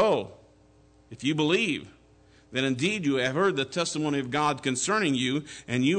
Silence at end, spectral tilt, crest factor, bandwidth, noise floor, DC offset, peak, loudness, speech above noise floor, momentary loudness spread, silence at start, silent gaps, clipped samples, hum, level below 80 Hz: 0 s; -4.5 dB/octave; 14 dB; 9.4 kHz; -58 dBFS; under 0.1%; -14 dBFS; -27 LUFS; 32 dB; 8 LU; 0 s; none; under 0.1%; none; -64 dBFS